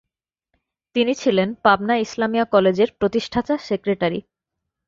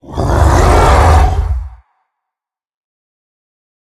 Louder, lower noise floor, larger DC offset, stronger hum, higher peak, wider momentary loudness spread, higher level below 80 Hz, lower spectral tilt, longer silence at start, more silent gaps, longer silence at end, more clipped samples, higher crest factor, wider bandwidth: second, -20 LUFS vs -10 LUFS; about the same, -81 dBFS vs -84 dBFS; neither; neither; about the same, -2 dBFS vs 0 dBFS; second, 6 LU vs 11 LU; second, -54 dBFS vs -16 dBFS; about the same, -5.5 dB/octave vs -6 dB/octave; first, 0.95 s vs 0.1 s; neither; second, 0.65 s vs 2.2 s; neither; first, 18 dB vs 12 dB; second, 7.6 kHz vs 13.5 kHz